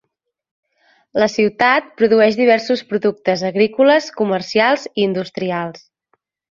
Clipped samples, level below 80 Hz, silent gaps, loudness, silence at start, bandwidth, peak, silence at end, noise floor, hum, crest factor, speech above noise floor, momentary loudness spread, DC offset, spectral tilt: under 0.1%; -62 dBFS; none; -16 LUFS; 1.15 s; 7.4 kHz; -2 dBFS; 0.8 s; -67 dBFS; none; 16 dB; 51 dB; 9 LU; under 0.1%; -5 dB/octave